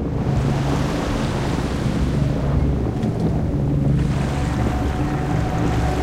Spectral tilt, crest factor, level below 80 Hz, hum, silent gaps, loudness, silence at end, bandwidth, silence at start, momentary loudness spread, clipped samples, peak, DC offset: -7.5 dB/octave; 12 dB; -26 dBFS; none; none; -21 LUFS; 0 s; 13 kHz; 0 s; 2 LU; under 0.1%; -8 dBFS; under 0.1%